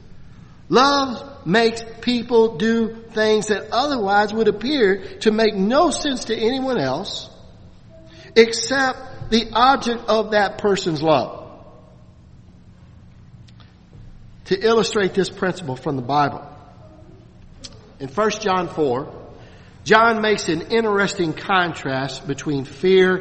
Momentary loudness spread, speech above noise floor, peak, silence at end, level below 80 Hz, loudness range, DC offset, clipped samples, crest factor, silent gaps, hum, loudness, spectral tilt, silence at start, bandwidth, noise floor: 12 LU; 27 dB; 0 dBFS; 0 s; -48 dBFS; 7 LU; under 0.1%; under 0.1%; 20 dB; none; none; -19 LUFS; -4.5 dB/octave; 0.05 s; 8.8 kHz; -46 dBFS